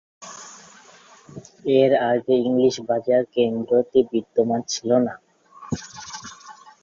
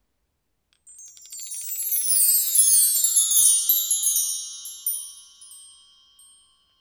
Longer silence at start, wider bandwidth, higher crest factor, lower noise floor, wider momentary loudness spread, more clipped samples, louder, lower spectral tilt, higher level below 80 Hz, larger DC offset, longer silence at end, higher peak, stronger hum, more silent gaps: second, 0.2 s vs 1 s; second, 7.6 kHz vs over 20 kHz; about the same, 18 dB vs 20 dB; second, -49 dBFS vs -74 dBFS; first, 22 LU vs 18 LU; neither; second, -21 LUFS vs -18 LUFS; first, -5 dB/octave vs 7 dB/octave; first, -60 dBFS vs -78 dBFS; neither; second, 0.3 s vs 1.15 s; about the same, -4 dBFS vs -4 dBFS; neither; neither